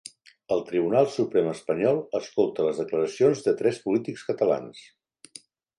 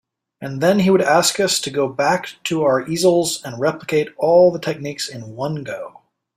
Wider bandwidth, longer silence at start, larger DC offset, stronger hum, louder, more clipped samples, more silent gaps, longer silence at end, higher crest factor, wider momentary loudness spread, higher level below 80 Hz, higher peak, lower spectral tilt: second, 11 kHz vs 16 kHz; about the same, 0.5 s vs 0.4 s; neither; neither; second, -25 LUFS vs -18 LUFS; neither; neither; first, 1 s vs 0.5 s; about the same, 18 dB vs 16 dB; about the same, 12 LU vs 14 LU; second, -70 dBFS vs -60 dBFS; second, -8 dBFS vs -2 dBFS; first, -6 dB/octave vs -4 dB/octave